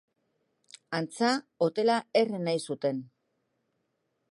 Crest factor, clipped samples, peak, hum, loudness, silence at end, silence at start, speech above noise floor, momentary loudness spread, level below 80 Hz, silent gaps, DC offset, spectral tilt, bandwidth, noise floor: 18 dB; under 0.1%; -12 dBFS; none; -29 LUFS; 1.25 s; 0.9 s; 50 dB; 8 LU; -82 dBFS; none; under 0.1%; -5 dB/octave; 11.5 kHz; -78 dBFS